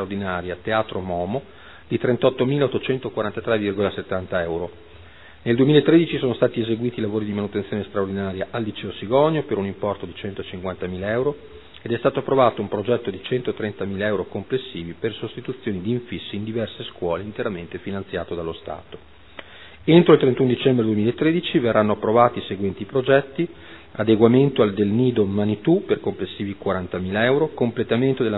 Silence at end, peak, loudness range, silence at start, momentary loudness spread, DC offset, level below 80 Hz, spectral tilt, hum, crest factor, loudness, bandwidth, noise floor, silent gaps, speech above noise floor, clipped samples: 0 s; 0 dBFS; 9 LU; 0 s; 13 LU; 0.4%; -54 dBFS; -10.5 dB/octave; none; 20 dB; -22 LUFS; 4.1 kHz; -45 dBFS; none; 24 dB; under 0.1%